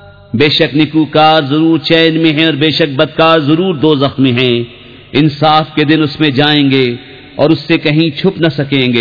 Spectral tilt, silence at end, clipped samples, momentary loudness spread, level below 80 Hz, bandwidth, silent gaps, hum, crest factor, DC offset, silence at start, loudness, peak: -7.5 dB/octave; 0 s; 0.6%; 5 LU; -46 dBFS; 5.4 kHz; none; none; 10 dB; 0.3%; 0.35 s; -10 LUFS; 0 dBFS